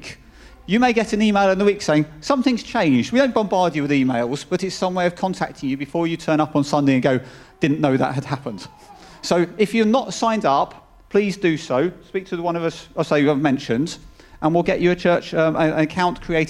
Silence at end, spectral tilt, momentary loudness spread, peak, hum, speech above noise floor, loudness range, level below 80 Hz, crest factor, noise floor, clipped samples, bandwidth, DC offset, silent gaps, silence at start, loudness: 0 s; -6 dB/octave; 9 LU; -2 dBFS; none; 26 dB; 3 LU; -48 dBFS; 18 dB; -45 dBFS; under 0.1%; 12.5 kHz; under 0.1%; none; 0 s; -20 LUFS